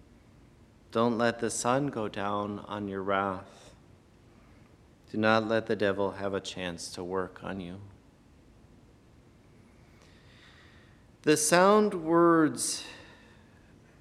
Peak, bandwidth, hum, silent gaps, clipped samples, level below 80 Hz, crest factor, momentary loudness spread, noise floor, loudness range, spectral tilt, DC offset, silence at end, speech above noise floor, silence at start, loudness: -8 dBFS; 14 kHz; none; none; under 0.1%; -64 dBFS; 24 dB; 16 LU; -58 dBFS; 14 LU; -4 dB/octave; under 0.1%; 0.95 s; 30 dB; 0.9 s; -28 LUFS